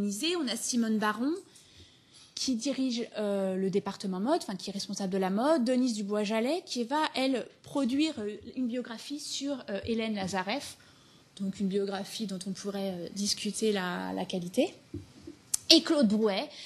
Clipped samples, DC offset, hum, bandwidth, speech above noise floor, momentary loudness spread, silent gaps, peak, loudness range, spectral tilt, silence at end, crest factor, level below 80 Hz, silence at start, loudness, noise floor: under 0.1%; under 0.1%; none; 13 kHz; 28 dB; 10 LU; none; -4 dBFS; 6 LU; -4 dB/octave; 0 s; 28 dB; -72 dBFS; 0 s; -31 LUFS; -59 dBFS